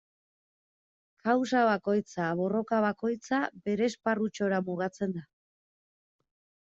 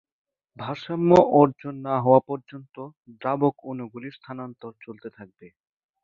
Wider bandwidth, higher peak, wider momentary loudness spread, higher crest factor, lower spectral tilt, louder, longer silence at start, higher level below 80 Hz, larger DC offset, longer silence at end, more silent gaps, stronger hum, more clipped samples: about the same, 7.8 kHz vs 7.4 kHz; second, -12 dBFS vs -2 dBFS; second, 8 LU vs 23 LU; about the same, 18 dB vs 22 dB; second, -6 dB/octave vs -8.5 dB/octave; second, -30 LUFS vs -21 LUFS; first, 1.25 s vs 0.6 s; second, -74 dBFS vs -62 dBFS; neither; first, 1.5 s vs 0.55 s; second, none vs 2.97-3.01 s; neither; neither